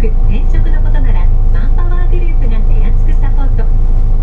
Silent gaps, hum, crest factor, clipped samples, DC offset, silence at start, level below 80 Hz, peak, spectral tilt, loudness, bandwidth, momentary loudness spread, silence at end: none; none; 6 dB; under 0.1%; under 0.1%; 0 s; -8 dBFS; 0 dBFS; -9 dB/octave; -16 LUFS; 3.4 kHz; 1 LU; 0 s